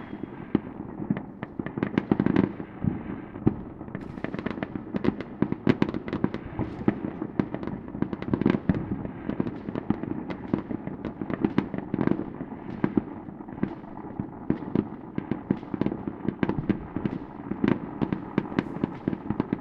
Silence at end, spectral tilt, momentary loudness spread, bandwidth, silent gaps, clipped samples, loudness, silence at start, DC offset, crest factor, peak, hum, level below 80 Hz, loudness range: 0 s; -9.5 dB/octave; 11 LU; 6.2 kHz; none; under 0.1%; -30 LUFS; 0 s; under 0.1%; 24 dB; -4 dBFS; none; -50 dBFS; 2 LU